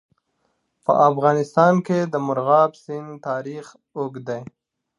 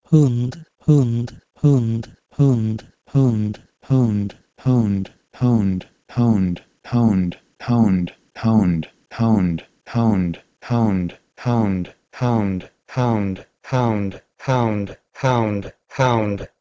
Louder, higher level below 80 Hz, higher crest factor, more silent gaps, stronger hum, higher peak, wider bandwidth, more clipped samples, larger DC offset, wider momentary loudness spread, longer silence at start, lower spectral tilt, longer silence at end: about the same, -20 LUFS vs -20 LUFS; second, -70 dBFS vs -44 dBFS; about the same, 18 dB vs 18 dB; neither; neither; about the same, -2 dBFS vs -2 dBFS; first, 11 kHz vs 7.8 kHz; neither; neither; first, 16 LU vs 12 LU; first, 0.9 s vs 0.1 s; about the same, -7.5 dB/octave vs -8.5 dB/octave; first, 0.55 s vs 0.15 s